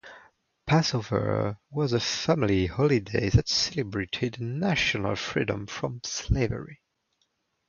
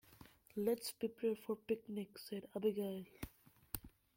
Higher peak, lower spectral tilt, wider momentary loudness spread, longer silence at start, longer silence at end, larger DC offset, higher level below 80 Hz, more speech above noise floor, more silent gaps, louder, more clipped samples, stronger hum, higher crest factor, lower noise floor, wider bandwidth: first, -8 dBFS vs -18 dBFS; about the same, -5 dB/octave vs -5.5 dB/octave; second, 8 LU vs 14 LU; about the same, 0.05 s vs 0.1 s; first, 0.95 s vs 0.3 s; neither; first, -42 dBFS vs -66 dBFS; first, 48 dB vs 22 dB; neither; first, -27 LUFS vs -43 LUFS; neither; neither; about the same, 20 dB vs 24 dB; first, -74 dBFS vs -64 dBFS; second, 7.4 kHz vs 16.5 kHz